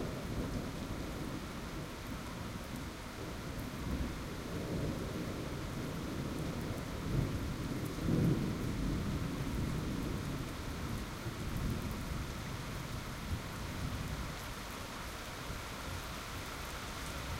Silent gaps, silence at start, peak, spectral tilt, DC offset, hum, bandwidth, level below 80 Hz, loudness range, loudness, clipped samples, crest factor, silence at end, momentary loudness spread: none; 0 s; -20 dBFS; -5.5 dB/octave; under 0.1%; none; 16.5 kHz; -46 dBFS; 6 LU; -40 LUFS; under 0.1%; 20 dB; 0 s; 6 LU